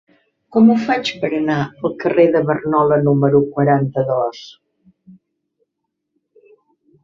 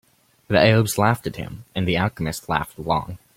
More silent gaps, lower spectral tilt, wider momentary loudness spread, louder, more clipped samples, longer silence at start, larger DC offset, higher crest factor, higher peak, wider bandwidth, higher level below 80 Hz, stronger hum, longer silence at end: neither; first, -7.5 dB/octave vs -5.5 dB/octave; second, 8 LU vs 13 LU; first, -16 LUFS vs -21 LUFS; neither; about the same, 0.5 s vs 0.5 s; neither; about the same, 16 dB vs 20 dB; about the same, -2 dBFS vs -2 dBFS; second, 7.2 kHz vs 16.5 kHz; second, -58 dBFS vs -46 dBFS; neither; first, 2.55 s vs 0.2 s